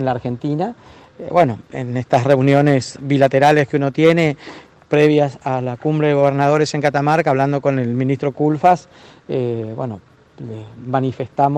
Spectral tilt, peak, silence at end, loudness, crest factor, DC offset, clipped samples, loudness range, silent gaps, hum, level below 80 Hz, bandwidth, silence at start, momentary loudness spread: -7 dB/octave; -2 dBFS; 0 s; -17 LUFS; 14 dB; under 0.1%; under 0.1%; 5 LU; none; none; -56 dBFS; 9.8 kHz; 0 s; 14 LU